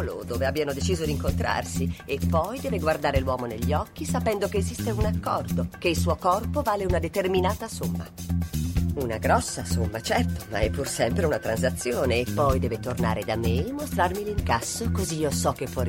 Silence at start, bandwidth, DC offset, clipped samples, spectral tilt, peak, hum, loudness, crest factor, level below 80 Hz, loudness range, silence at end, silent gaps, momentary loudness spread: 0 s; 16.5 kHz; under 0.1%; under 0.1%; -5.5 dB/octave; -8 dBFS; none; -26 LUFS; 18 dB; -36 dBFS; 1 LU; 0 s; none; 5 LU